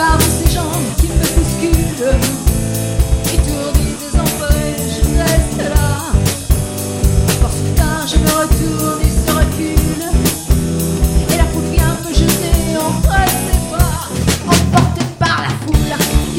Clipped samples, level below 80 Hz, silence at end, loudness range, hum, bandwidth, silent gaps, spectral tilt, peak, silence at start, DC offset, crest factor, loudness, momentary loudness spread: under 0.1%; -18 dBFS; 0 s; 1 LU; none; 17 kHz; none; -5 dB/octave; 0 dBFS; 0 s; under 0.1%; 14 dB; -15 LUFS; 4 LU